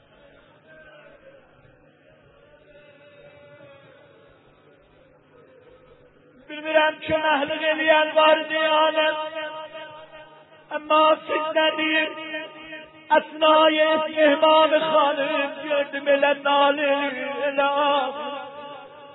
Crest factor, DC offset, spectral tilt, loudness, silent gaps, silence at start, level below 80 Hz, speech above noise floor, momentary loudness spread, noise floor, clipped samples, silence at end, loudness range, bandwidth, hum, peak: 18 dB; under 0.1%; -7.5 dB/octave; -20 LUFS; none; 6.5 s; -66 dBFS; 35 dB; 20 LU; -55 dBFS; under 0.1%; 0 s; 5 LU; 4.1 kHz; none; -4 dBFS